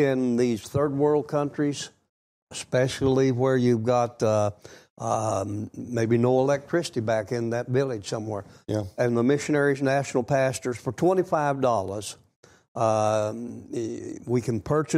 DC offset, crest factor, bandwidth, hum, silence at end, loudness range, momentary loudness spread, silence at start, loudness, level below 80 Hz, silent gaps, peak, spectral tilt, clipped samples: under 0.1%; 14 dB; 14.5 kHz; none; 0 s; 2 LU; 11 LU; 0 s; -25 LUFS; -58 dBFS; 2.09-2.47 s, 4.90-4.96 s, 12.36-12.43 s, 12.68-12.75 s; -10 dBFS; -6 dB/octave; under 0.1%